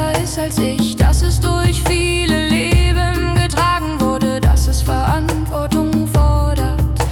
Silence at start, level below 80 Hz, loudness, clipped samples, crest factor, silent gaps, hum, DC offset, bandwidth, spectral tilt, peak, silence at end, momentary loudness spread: 0 s; -18 dBFS; -16 LUFS; under 0.1%; 12 dB; none; none; under 0.1%; 18 kHz; -5.5 dB/octave; -4 dBFS; 0 s; 4 LU